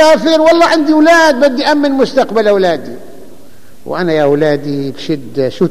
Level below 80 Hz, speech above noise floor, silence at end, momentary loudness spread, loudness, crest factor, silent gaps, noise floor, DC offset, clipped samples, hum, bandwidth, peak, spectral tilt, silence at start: -50 dBFS; 31 dB; 0 s; 12 LU; -11 LUFS; 10 dB; none; -41 dBFS; 4%; under 0.1%; none; 15 kHz; 0 dBFS; -5 dB/octave; 0 s